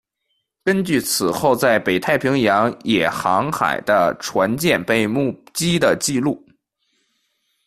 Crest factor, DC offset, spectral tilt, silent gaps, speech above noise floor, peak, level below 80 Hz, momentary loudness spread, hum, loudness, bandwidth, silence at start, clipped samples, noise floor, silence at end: 16 dB; under 0.1%; -4.5 dB/octave; none; 54 dB; -2 dBFS; -54 dBFS; 5 LU; none; -18 LUFS; 15.5 kHz; 0.65 s; under 0.1%; -72 dBFS; 1.3 s